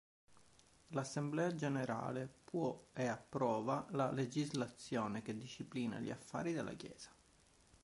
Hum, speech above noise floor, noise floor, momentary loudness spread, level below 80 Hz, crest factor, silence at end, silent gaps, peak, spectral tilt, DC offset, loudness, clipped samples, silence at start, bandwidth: none; 28 dB; -70 dBFS; 9 LU; -74 dBFS; 18 dB; 0.75 s; none; -24 dBFS; -6 dB/octave; under 0.1%; -42 LUFS; under 0.1%; 0.3 s; 11.5 kHz